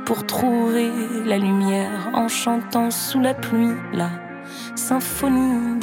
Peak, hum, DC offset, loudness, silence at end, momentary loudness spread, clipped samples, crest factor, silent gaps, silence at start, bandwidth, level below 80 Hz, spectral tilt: -4 dBFS; none; under 0.1%; -21 LUFS; 0 s; 7 LU; under 0.1%; 16 dB; none; 0 s; 17 kHz; -52 dBFS; -4.5 dB/octave